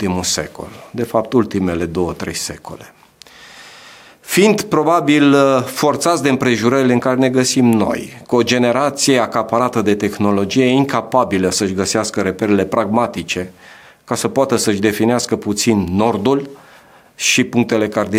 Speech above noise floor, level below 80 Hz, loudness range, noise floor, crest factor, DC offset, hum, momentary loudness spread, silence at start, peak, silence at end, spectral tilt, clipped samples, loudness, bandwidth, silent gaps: 30 dB; -50 dBFS; 6 LU; -45 dBFS; 14 dB; under 0.1%; none; 9 LU; 0 s; 0 dBFS; 0 s; -4.5 dB/octave; under 0.1%; -15 LUFS; 16.5 kHz; none